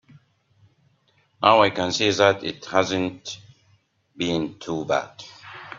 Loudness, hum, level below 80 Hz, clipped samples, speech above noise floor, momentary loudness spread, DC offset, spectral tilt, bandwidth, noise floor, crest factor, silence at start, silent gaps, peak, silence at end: -22 LUFS; none; -62 dBFS; under 0.1%; 42 dB; 21 LU; under 0.1%; -4 dB/octave; 7.6 kHz; -64 dBFS; 24 dB; 1.4 s; none; 0 dBFS; 0 s